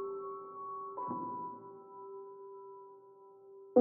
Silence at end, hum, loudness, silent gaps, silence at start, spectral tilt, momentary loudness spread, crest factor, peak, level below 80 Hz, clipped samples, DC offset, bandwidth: 0 s; none; -42 LUFS; none; 0 s; -6 dB/octave; 16 LU; 26 dB; -14 dBFS; under -90 dBFS; under 0.1%; under 0.1%; 2.4 kHz